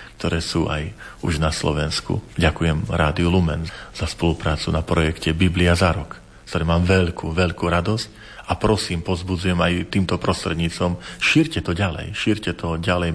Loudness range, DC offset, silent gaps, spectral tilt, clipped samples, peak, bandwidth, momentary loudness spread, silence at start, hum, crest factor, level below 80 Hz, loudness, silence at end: 2 LU; under 0.1%; none; -5.5 dB/octave; under 0.1%; -4 dBFS; 11 kHz; 10 LU; 0 s; none; 16 dB; -34 dBFS; -21 LUFS; 0 s